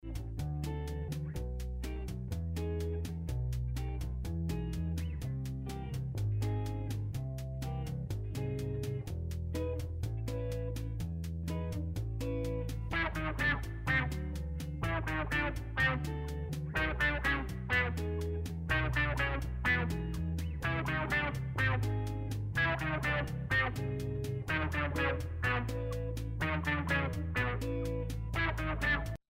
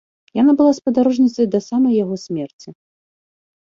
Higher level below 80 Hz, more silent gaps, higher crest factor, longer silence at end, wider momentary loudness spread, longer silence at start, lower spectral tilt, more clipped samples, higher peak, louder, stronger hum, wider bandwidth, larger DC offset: first, -42 dBFS vs -62 dBFS; second, none vs 2.53-2.59 s; about the same, 16 dB vs 14 dB; second, 0.15 s vs 0.9 s; second, 8 LU vs 13 LU; second, 0.05 s vs 0.35 s; about the same, -6 dB/octave vs -7 dB/octave; neither; second, -20 dBFS vs -4 dBFS; second, -35 LUFS vs -17 LUFS; neither; first, 16 kHz vs 7.6 kHz; neither